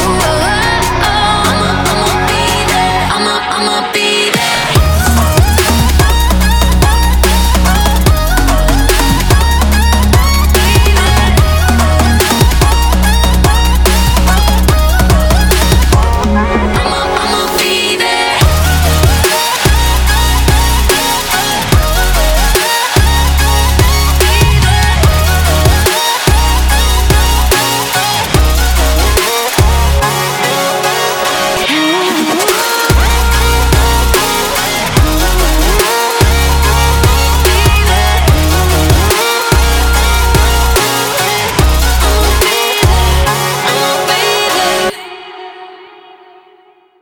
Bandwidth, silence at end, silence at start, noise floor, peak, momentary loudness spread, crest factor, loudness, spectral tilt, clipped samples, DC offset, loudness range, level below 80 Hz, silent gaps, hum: over 20 kHz; 1.15 s; 0 s; -45 dBFS; 0 dBFS; 2 LU; 10 dB; -10 LUFS; -4 dB/octave; under 0.1%; under 0.1%; 2 LU; -12 dBFS; none; none